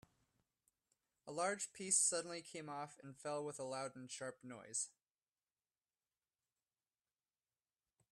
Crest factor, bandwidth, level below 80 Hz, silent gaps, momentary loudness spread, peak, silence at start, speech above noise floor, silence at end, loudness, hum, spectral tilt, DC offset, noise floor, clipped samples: 26 dB; 14.5 kHz; -90 dBFS; none; 17 LU; -22 dBFS; 1.25 s; over 46 dB; 3.2 s; -42 LUFS; none; -2 dB/octave; under 0.1%; under -90 dBFS; under 0.1%